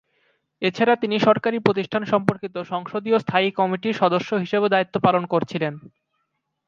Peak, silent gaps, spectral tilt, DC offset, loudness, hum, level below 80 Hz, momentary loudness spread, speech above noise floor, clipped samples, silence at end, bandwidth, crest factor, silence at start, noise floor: 0 dBFS; none; -7 dB/octave; under 0.1%; -21 LUFS; none; -66 dBFS; 9 LU; 54 dB; under 0.1%; 0.8 s; 7.4 kHz; 22 dB; 0.6 s; -75 dBFS